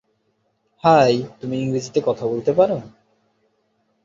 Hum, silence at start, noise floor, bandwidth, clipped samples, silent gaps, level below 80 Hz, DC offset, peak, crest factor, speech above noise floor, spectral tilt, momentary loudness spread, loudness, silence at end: none; 0.85 s; -68 dBFS; 7.8 kHz; under 0.1%; none; -60 dBFS; under 0.1%; -2 dBFS; 20 dB; 49 dB; -6 dB/octave; 10 LU; -19 LUFS; 1.15 s